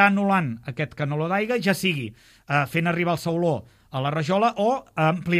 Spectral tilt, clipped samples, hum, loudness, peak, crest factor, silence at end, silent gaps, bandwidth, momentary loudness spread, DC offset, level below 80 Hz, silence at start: -6 dB/octave; under 0.1%; none; -24 LUFS; -4 dBFS; 20 dB; 0 s; none; 15.5 kHz; 9 LU; under 0.1%; -60 dBFS; 0 s